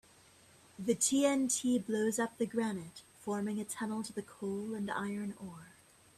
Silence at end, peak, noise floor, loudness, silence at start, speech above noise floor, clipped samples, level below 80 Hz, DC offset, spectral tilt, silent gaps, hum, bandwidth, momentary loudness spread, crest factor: 0.5 s; -16 dBFS; -62 dBFS; -35 LUFS; 0.8 s; 27 dB; under 0.1%; -74 dBFS; under 0.1%; -4 dB/octave; none; none; 15 kHz; 14 LU; 20 dB